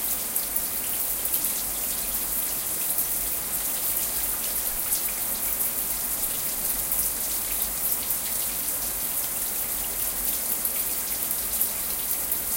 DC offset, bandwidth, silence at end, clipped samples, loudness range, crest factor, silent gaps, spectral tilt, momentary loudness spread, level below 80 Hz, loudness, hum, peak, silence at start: under 0.1%; 17.5 kHz; 0 s; under 0.1%; 1 LU; 22 dB; none; -0.5 dB/octave; 2 LU; -48 dBFS; -24 LUFS; none; -6 dBFS; 0 s